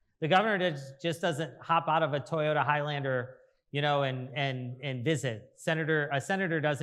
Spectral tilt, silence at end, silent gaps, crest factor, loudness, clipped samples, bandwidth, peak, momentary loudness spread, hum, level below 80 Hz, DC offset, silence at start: -5.5 dB/octave; 0 s; none; 20 dB; -30 LUFS; under 0.1%; 13 kHz; -10 dBFS; 10 LU; none; -78 dBFS; under 0.1%; 0.2 s